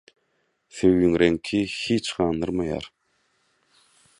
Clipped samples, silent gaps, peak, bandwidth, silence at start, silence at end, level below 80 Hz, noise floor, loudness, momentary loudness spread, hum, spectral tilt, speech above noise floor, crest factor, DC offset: under 0.1%; none; -4 dBFS; 11 kHz; 0.75 s; 1.35 s; -48 dBFS; -71 dBFS; -23 LUFS; 13 LU; none; -5.5 dB/octave; 49 dB; 20 dB; under 0.1%